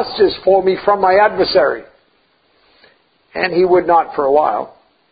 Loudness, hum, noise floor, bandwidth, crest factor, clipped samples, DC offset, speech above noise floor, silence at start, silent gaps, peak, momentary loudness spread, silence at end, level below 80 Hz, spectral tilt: -14 LUFS; none; -58 dBFS; 5 kHz; 16 dB; under 0.1%; under 0.1%; 44 dB; 0 s; none; 0 dBFS; 11 LU; 0.45 s; -50 dBFS; -9.5 dB/octave